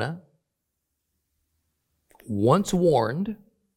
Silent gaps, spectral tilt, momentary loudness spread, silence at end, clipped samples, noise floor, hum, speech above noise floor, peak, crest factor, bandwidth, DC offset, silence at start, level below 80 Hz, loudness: none; -6.5 dB/octave; 17 LU; 0.4 s; under 0.1%; -80 dBFS; none; 58 dB; -6 dBFS; 22 dB; 16.5 kHz; under 0.1%; 0 s; -56 dBFS; -24 LUFS